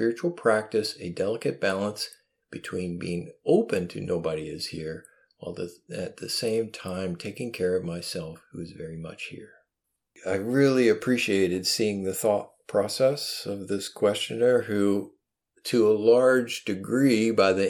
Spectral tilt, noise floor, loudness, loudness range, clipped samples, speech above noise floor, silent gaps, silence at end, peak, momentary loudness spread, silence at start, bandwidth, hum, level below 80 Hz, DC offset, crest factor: -5 dB/octave; -83 dBFS; -26 LUFS; 8 LU; under 0.1%; 57 dB; none; 0 s; -8 dBFS; 16 LU; 0 s; 17 kHz; none; -64 dBFS; under 0.1%; 18 dB